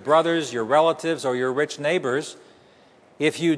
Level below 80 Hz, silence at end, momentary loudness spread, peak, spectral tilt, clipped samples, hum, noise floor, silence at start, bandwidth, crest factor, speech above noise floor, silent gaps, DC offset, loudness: -74 dBFS; 0 s; 7 LU; -6 dBFS; -4.5 dB/octave; under 0.1%; none; -54 dBFS; 0 s; 11 kHz; 16 dB; 32 dB; none; under 0.1%; -22 LUFS